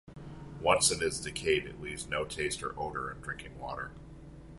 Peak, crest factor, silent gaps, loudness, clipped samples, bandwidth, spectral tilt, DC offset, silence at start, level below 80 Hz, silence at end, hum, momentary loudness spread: -10 dBFS; 24 dB; none; -32 LUFS; under 0.1%; 12 kHz; -2.5 dB/octave; under 0.1%; 0.05 s; -52 dBFS; 0 s; none; 22 LU